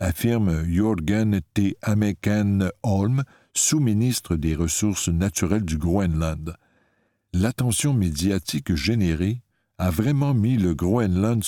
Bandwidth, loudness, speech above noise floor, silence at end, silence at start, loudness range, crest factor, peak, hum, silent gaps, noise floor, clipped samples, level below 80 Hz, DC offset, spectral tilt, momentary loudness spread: 18 kHz; -23 LUFS; 46 dB; 0 s; 0 s; 2 LU; 16 dB; -6 dBFS; none; none; -67 dBFS; under 0.1%; -38 dBFS; under 0.1%; -5.5 dB/octave; 5 LU